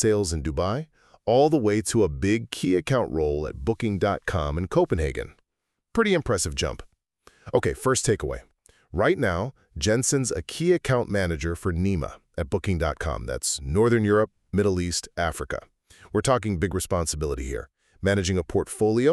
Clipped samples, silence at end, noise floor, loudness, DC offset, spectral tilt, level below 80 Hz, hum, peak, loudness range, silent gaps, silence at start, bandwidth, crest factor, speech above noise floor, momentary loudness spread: under 0.1%; 0 s; -82 dBFS; -25 LUFS; under 0.1%; -5 dB/octave; -40 dBFS; none; -6 dBFS; 3 LU; none; 0 s; 13.5 kHz; 18 dB; 58 dB; 10 LU